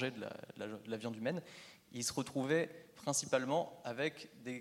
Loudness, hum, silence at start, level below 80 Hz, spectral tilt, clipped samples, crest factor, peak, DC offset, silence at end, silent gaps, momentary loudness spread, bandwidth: -39 LUFS; none; 0 s; -78 dBFS; -4 dB/octave; under 0.1%; 22 dB; -18 dBFS; under 0.1%; 0 s; none; 13 LU; 16.5 kHz